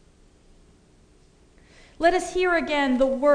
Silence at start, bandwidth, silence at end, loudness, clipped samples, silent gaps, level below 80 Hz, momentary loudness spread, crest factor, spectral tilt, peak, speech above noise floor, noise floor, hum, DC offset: 2 s; 10 kHz; 0 s; -22 LUFS; under 0.1%; none; -48 dBFS; 2 LU; 18 dB; -3.5 dB/octave; -6 dBFS; 35 dB; -56 dBFS; none; under 0.1%